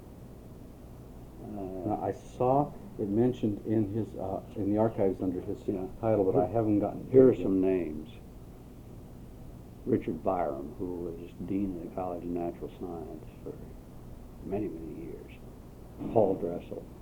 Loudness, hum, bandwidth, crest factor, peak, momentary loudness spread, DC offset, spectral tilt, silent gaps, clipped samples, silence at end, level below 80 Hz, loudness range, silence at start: -31 LUFS; none; 19 kHz; 22 dB; -8 dBFS; 22 LU; under 0.1%; -9.5 dB/octave; none; under 0.1%; 0 s; -50 dBFS; 11 LU; 0 s